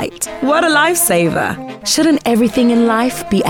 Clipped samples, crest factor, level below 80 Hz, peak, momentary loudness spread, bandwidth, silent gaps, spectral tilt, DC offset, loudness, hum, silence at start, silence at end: under 0.1%; 12 dB; -46 dBFS; -2 dBFS; 8 LU; 18.5 kHz; none; -3.5 dB/octave; under 0.1%; -13 LUFS; none; 0 s; 0 s